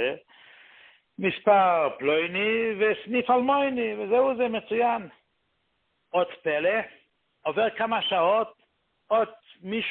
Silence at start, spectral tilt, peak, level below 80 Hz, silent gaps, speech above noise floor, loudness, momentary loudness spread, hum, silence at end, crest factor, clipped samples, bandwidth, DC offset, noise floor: 0 s; -9 dB/octave; -8 dBFS; -70 dBFS; none; 49 dB; -25 LUFS; 10 LU; none; 0 s; 18 dB; under 0.1%; 4.3 kHz; under 0.1%; -74 dBFS